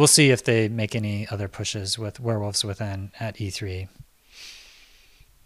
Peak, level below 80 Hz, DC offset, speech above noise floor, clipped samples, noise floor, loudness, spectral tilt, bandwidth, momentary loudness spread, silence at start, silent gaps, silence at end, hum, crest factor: -2 dBFS; -56 dBFS; under 0.1%; 31 dB; under 0.1%; -54 dBFS; -24 LUFS; -3.5 dB/octave; 15.5 kHz; 23 LU; 0 s; none; 0.85 s; none; 24 dB